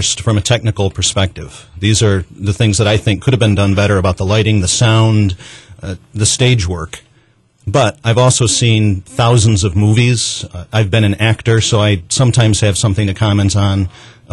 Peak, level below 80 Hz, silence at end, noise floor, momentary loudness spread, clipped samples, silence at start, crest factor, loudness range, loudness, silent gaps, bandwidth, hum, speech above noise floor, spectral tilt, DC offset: -2 dBFS; -36 dBFS; 0.25 s; -52 dBFS; 9 LU; under 0.1%; 0 s; 12 dB; 2 LU; -13 LUFS; none; 11.5 kHz; none; 40 dB; -4.5 dB/octave; under 0.1%